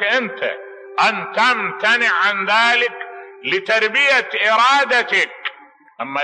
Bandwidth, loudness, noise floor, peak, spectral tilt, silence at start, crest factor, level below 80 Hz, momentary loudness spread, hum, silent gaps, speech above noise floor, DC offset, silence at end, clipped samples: 10.5 kHz; -16 LUFS; -43 dBFS; -4 dBFS; -2 dB/octave; 0 s; 14 dB; -80 dBFS; 15 LU; none; none; 26 dB; under 0.1%; 0 s; under 0.1%